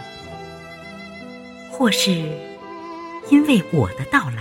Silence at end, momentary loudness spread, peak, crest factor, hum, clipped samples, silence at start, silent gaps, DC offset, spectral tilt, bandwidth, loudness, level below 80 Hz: 0 s; 20 LU; -2 dBFS; 18 dB; none; under 0.1%; 0 s; none; under 0.1%; -5 dB/octave; 16.5 kHz; -18 LUFS; -52 dBFS